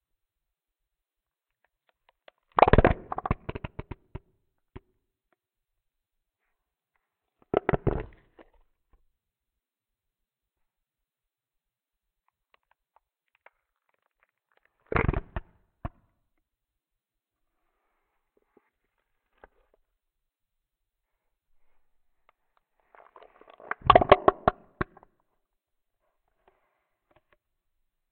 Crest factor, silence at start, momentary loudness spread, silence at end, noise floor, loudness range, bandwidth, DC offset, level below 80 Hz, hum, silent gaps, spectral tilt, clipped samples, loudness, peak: 28 dB; 2.55 s; 24 LU; 3.3 s; -90 dBFS; 15 LU; 4.5 kHz; under 0.1%; -42 dBFS; none; none; -10 dB/octave; under 0.1%; -25 LUFS; -4 dBFS